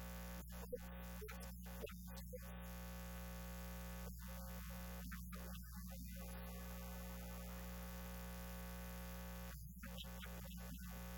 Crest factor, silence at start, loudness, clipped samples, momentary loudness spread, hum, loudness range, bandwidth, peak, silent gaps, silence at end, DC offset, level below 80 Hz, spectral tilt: 16 dB; 0 s; -52 LUFS; under 0.1%; 1 LU; 60 Hz at -50 dBFS; 1 LU; 17.5 kHz; -36 dBFS; none; 0 s; under 0.1%; -54 dBFS; -5 dB/octave